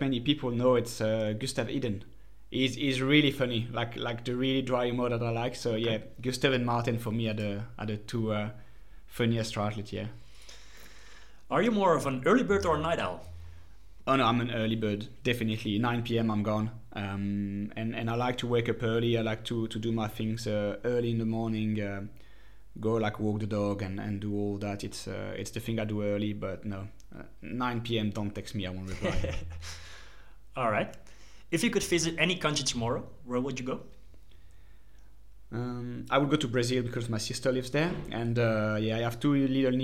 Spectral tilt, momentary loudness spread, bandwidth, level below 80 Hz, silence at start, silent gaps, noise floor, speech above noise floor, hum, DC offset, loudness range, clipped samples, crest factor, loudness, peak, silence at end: -5.5 dB/octave; 12 LU; 16.5 kHz; -52 dBFS; 0 s; none; -56 dBFS; 26 dB; none; 0.5%; 6 LU; under 0.1%; 22 dB; -30 LUFS; -10 dBFS; 0 s